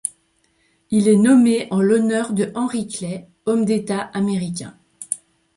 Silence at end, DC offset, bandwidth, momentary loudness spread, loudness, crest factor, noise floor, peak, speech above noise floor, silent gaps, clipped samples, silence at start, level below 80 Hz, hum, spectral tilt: 0.4 s; under 0.1%; 11.5 kHz; 15 LU; -19 LUFS; 16 dB; -63 dBFS; -4 dBFS; 45 dB; none; under 0.1%; 0.05 s; -62 dBFS; none; -5.5 dB/octave